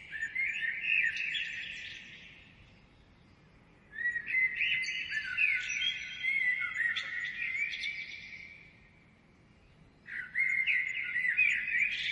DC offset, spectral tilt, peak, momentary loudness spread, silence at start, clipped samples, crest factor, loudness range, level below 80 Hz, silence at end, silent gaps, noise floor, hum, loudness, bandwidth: under 0.1%; 0 dB/octave; -18 dBFS; 15 LU; 0 s; under 0.1%; 18 dB; 8 LU; -68 dBFS; 0 s; none; -62 dBFS; none; -31 LUFS; 11 kHz